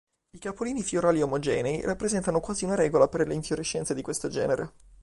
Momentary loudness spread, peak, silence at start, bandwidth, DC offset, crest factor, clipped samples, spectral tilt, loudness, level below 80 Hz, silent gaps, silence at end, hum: 8 LU; -6 dBFS; 0.35 s; 11.5 kHz; under 0.1%; 20 dB; under 0.1%; -5 dB/octave; -27 LUFS; -52 dBFS; none; 0.35 s; none